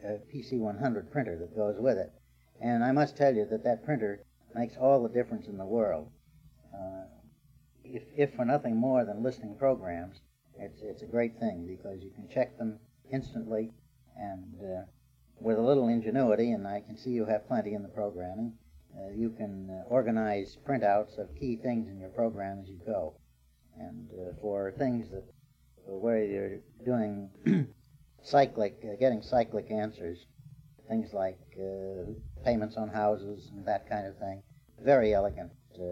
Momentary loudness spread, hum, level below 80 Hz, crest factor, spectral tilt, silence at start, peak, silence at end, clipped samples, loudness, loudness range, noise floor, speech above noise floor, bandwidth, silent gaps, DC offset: 16 LU; none; -58 dBFS; 20 dB; -8.5 dB/octave; 0 s; -12 dBFS; 0 s; under 0.1%; -32 LUFS; 7 LU; -64 dBFS; 33 dB; 7.6 kHz; none; under 0.1%